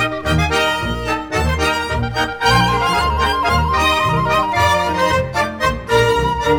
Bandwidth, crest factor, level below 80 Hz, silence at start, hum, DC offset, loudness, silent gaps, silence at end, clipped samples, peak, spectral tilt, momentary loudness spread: over 20 kHz; 16 dB; -28 dBFS; 0 s; none; under 0.1%; -16 LUFS; none; 0 s; under 0.1%; 0 dBFS; -4.5 dB/octave; 6 LU